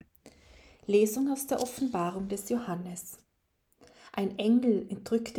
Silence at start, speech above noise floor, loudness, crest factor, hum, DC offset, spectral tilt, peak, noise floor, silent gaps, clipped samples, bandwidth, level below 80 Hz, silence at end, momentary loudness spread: 0.25 s; 45 dB; -30 LUFS; 18 dB; none; under 0.1%; -5.5 dB/octave; -14 dBFS; -74 dBFS; none; under 0.1%; 19 kHz; -64 dBFS; 0 s; 15 LU